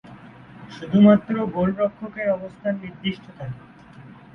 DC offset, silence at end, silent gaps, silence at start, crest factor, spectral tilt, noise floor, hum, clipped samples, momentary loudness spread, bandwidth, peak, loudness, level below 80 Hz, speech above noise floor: under 0.1%; 0.2 s; none; 0.05 s; 20 dB; -9 dB/octave; -45 dBFS; none; under 0.1%; 21 LU; 5.8 kHz; -2 dBFS; -21 LUFS; -56 dBFS; 23 dB